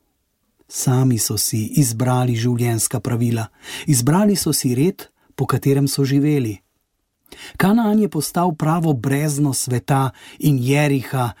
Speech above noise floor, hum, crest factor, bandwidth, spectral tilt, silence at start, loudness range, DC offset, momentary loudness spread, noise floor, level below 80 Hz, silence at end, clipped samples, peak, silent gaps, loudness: 52 dB; none; 14 dB; 17 kHz; -5.5 dB/octave; 0.7 s; 1 LU; under 0.1%; 9 LU; -70 dBFS; -52 dBFS; 0.05 s; under 0.1%; -4 dBFS; none; -18 LUFS